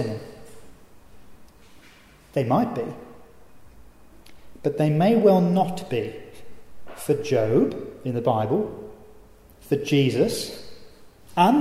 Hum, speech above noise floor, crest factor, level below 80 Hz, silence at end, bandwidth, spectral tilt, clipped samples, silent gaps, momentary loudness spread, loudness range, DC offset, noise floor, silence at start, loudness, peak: none; 29 dB; 20 dB; -56 dBFS; 0 s; 15.5 kHz; -7 dB/octave; under 0.1%; none; 19 LU; 8 LU; under 0.1%; -51 dBFS; 0 s; -23 LUFS; -6 dBFS